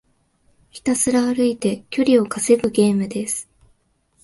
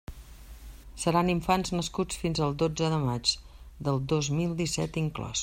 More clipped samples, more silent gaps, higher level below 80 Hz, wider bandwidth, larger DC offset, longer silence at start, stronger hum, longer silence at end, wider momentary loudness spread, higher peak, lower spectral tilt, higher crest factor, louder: neither; neither; second, -56 dBFS vs -46 dBFS; second, 12 kHz vs 16 kHz; neither; first, 0.75 s vs 0.1 s; neither; first, 0.8 s vs 0 s; second, 8 LU vs 14 LU; first, -4 dBFS vs -10 dBFS; about the same, -4.5 dB/octave vs -5 dB/octave; about the same, 16 dB vs 18 dB; first, -19 LUFS vs -29 LUFS